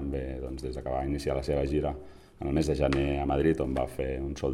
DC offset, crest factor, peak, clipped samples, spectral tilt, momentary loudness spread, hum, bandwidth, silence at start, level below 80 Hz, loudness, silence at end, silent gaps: under 0.1%; 18 dB; -12 dBFS; under 0.1%; -7 dB/octave; 10 LU; none; 13 kHz; 0 s; -38 dBFS; -30 LUFS; 0 s; none